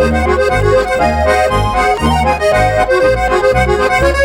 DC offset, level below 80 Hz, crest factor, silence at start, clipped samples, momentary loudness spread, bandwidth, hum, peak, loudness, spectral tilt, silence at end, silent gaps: under 0.1%; -22 dBFS; 10 dB; 0 s; under 0.1%; 1 LU; 16.5 kHz; none; 0 dBFS; -12 LUFS; -5.5 dB/octave; 0 s; none